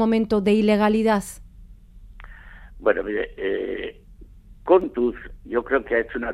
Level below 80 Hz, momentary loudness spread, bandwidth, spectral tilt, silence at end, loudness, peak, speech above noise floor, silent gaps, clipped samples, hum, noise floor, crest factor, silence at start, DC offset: -44 dBFS; 16 LU; 13.5 kHz; -6 dB/octave; 0 s; -22 LUFS; -4 dBFS; 24 dB; none; under 0.1%; none; -45 dBFS; 18 dB; 0 s; under 0.1%